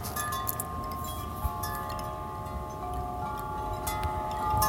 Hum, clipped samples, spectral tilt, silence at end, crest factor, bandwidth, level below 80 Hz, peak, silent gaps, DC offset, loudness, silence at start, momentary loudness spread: none; under 0.1%; -4.5 dB/octave; 0 s; 26 dB; 17 kHz; -42 dBFS; -6 dBFS; none; under 0.1%; -34 LUFS; 0 s; 6 LU